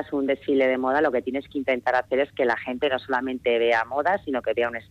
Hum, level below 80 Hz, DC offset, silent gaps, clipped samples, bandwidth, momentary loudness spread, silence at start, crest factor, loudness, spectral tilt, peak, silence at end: none; -60 dBFS; under 0.1%; none; under 0.1%; 8.6 kHz; 5 LU; 0 s; 12 dB; -24 LUFS; -6 dB/octave; -12 dBFS; 0.1 s